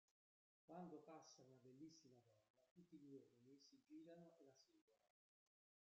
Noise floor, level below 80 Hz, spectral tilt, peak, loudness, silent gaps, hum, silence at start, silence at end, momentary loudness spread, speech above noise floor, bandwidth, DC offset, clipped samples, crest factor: under -90 dBFS; under -90 dBFS; -6 dB/octave; -48 dBFS; -65 LUFS; 0.11-0.68 s, 2.50-2.54 s, 2.71-2.76 s, 4.81-4.88 s; none; 0.1 s; 0.8 s; 8 LU; over 22 dB; 7.4 kHz; under 0.1%; under 0.1%; 20 dB